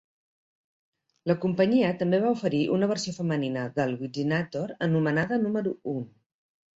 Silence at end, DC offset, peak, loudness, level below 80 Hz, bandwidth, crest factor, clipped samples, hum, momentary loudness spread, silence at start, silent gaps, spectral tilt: 0.7 s; under 0.1%; -10 dBFS; -27 LUFS; -66 dBFS; 8 kHz; 18 dB; under 0.1%; none; 9 LU; 1.25 s; none; -6.5 dB/octave